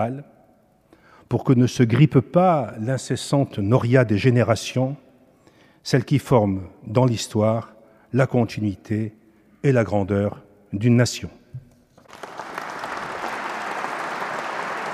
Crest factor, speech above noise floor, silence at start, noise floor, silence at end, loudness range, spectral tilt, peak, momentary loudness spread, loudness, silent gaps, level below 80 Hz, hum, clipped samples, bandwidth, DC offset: 20 dB; 38 dB; 0 s; -58 dBFS; 0 s; 7 LU; -6.5 dB/octave; -2 dBFS; 16 LU; -22 LUFS; none; -56 dBFS; none; under 0.1%; 13.5 kHz; under 0.1%